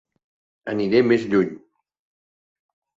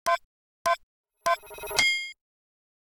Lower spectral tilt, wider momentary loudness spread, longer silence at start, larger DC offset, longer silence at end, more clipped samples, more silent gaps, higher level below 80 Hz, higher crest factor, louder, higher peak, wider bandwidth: first, -7.5 dB/octave vs 0 dB/octave; about the same, 11 LU vs 9 LU; first, 0.65 s vs 0.05 s; neither; first, 1.4 s vs 0.85 s; neither; second, none vs 0.24-0.65 s, 0.83-1.04 s; about the same, -62 dBFS vs -62 dBFS; about the same, 18 dB vs 22 dB; first, -20 LUFS vs -27 LUFS; about the same, -6 dBFS vs -8 dBFS; second, 7.6 kHz vs over 20 kHz